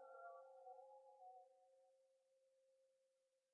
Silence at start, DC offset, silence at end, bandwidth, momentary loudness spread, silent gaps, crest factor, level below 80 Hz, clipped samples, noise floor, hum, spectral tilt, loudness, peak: 0 s; under 0.1%; 0.15 s; 1.6 kHz; 6 LU; none; 18 dB; under -90 dBFS; under 0.1%; -87 dBFS; none; 15 dB/octave; -63 LUFS; -48 dBFS